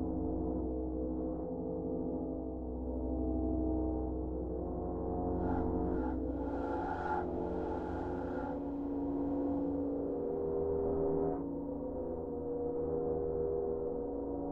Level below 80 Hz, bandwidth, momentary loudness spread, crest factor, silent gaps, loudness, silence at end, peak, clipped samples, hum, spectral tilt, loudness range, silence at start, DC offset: -46 dBFS; 4.5 kHz; 5 LU; 14 dB; none; -37 LUFS; 0 s; -22 dBFS; under 0.1%; none; -11 dB/octave; 2 LU; 0 s; under 0.1%